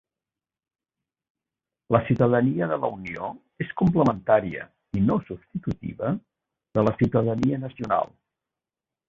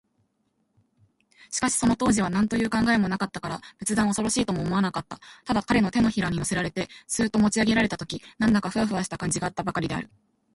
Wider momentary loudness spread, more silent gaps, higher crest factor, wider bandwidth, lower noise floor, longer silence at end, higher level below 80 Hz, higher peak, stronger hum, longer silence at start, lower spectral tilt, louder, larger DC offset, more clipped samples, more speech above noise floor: about the same, 13 LU vs 11 LU; neither; about the same, 22 dB vs 18 dB; second, 7.4 kHz vs 11.5 kHz; first, under -90 dBFS vs -72 dBFS; first, 1.05 s vs 0.5 s; about the same, -52 dBFS vs -50 dBFS; first, -4 dBFS vs -8 dBFS; neither; first, 1.9 s vs 1.5 s; first, -9.5 dB/octave vs -4.5 dB/octave; about the same, -25 LUFS vs -25 LUFS; neither; neither; first, over 66 dB vs 48 dB